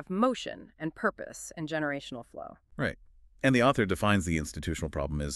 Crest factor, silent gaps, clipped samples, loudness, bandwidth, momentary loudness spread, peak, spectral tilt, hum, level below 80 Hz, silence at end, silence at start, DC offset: 20 dB; none; under 0.1%; -30 LUFS; 13.5 kHz; 17 LU; -10 dBFS; -5.5 dB/octave; none; -46 dBFS; 0 s; 0 s; under 0.1%